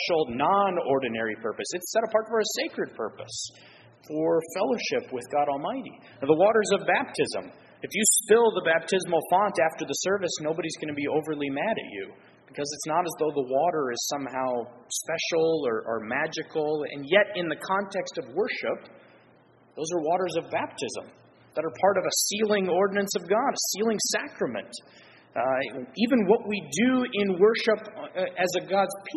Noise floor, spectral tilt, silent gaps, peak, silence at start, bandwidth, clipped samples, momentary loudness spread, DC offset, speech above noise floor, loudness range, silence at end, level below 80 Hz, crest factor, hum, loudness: -58 dBFS; -3 dB/octave; none; -6 dBFS; 0 s; 12 kHz; under 0.1%; 12 LU; under 0.1%; 32 dB; 6 LU; 0 s; -70 dBFS; 20 dB; none; -26 LUFS